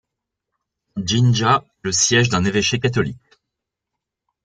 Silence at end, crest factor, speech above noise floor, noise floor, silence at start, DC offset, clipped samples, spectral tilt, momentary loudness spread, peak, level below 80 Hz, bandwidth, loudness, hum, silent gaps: 1.3 s; 18 dB; 65 dB; -82 dBFS; 0.95 s; under 0.1%; under 0.1%; -4 dB/octave; 10 LU; -2 dBFS; -52 dBFS; 9.4 kHz; -18 LUFS; none; none